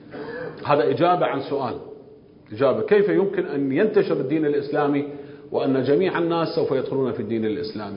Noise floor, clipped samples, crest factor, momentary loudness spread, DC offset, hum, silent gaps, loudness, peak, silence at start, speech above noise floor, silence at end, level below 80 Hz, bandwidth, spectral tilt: -47 dBFS; under 0.1%; 18 dB; 13 LU; under 0.1%; none; none; -22 LUFS; -4 dBFS; 0 s; 26 dB; 0 s; -62 dBFS; 5.4 kHz; -11.5 dB/octave